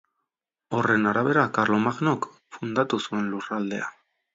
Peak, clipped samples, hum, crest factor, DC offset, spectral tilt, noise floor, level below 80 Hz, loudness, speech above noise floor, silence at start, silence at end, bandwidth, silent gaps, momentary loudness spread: -8 dBFS; under 0.1%; none; 18 dB; under 0.1%; -6 dB/octave; -85 dBFS; -68 dBFS; -25 LUFS; 60 dB; 0.7 s; 0.45 s; 7.8 kHz; none; 10 LU